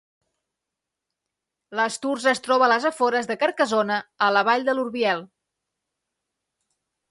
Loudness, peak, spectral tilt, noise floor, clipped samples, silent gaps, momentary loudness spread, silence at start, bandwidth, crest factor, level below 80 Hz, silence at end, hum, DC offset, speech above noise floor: -22 LUFS; -6 dBFS; -3 dB/octave; -85 dBFS; under 0.1%; none; 7 LU; 1.7 s; 11.5 kHz; 20 dB; -76 dBFS; 1.85 s; none; under 0.1%; 63 dB